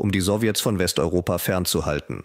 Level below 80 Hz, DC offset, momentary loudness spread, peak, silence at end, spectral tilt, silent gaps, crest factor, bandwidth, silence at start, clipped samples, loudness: -42 dBFS; under 0.1%; 2 LU; -8 dBFS; 0 s; -4.5 dB/octave; none; 14 dB; 16 kHz; 0 s; under 0.1%; -22 LUFS